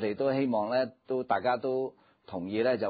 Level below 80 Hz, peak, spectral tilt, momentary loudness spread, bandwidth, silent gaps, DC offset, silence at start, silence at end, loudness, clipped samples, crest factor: -68 dBFS; -14 dBFS; -4.5 dB/octave; 9 LU; 4.9 kHz; none; under 0.1%; 0 s; 0 s; -30 LUFS; under 0.1%; 16 dB